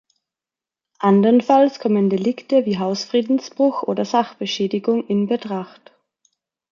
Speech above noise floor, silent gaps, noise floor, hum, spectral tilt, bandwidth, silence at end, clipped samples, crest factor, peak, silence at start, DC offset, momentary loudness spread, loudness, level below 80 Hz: 71 dB; none; -89 dBFS; none; -6.5 dB/octave; 7.2 kHz; 1.05 s; under 0.1%; 16 dB; -2 dBFS; 1 s; under 0.1%; 9 LU; -19 LUFS; -68 dBFS